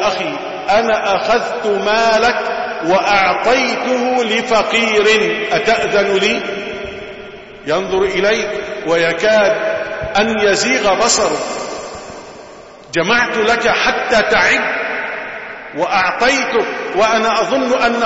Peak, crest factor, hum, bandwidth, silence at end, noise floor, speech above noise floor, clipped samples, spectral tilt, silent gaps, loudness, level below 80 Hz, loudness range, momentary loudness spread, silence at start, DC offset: 0 dBFS; 14 dB; none; 8 kHz; 0 s; -36 dBFS; 22 dB; under 0.1%; -2.5 dB/octave; none; -14 LUFS; -46 dBFS; 3 LU; 13 LU; 0 s; under 0.1%